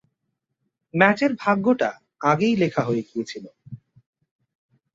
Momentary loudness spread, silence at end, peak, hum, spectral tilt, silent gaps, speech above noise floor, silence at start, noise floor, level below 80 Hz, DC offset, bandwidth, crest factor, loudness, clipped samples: 14 LU; 1.2 s; -2 dBFS; none; -6.5 dB/octave; none; 57 dB; 0.95 s; -78 dBFS; -66 dBFS; under 0.1%; 7.8 kHz; 22 dB; -22 LUFS; under 0.1%